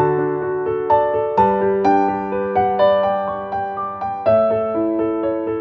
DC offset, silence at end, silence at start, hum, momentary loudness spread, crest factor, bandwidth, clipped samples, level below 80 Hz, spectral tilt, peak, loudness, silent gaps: under 0.1%; 0 s; 0 s; none; 8 LU; 16 dB; 6.2 kHz; under 0.1%; -50 dBFS; -8.5 dB/octave; -2 dBFS; -18 LUFS; none